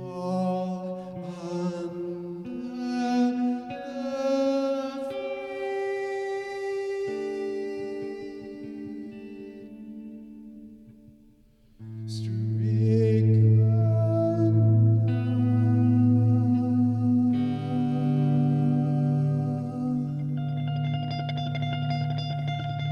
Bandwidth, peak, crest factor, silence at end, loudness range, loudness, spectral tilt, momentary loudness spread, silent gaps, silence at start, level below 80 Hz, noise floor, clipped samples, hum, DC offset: 6.8 kHz; -12 dBFS; 14 dB; 0 s; 15 LU; -26 LUFS; -9 dB/octave; 17 LU; none; 0 s; -62 dBFS; -57 dBFS; under 0.1%; none; under 0.1%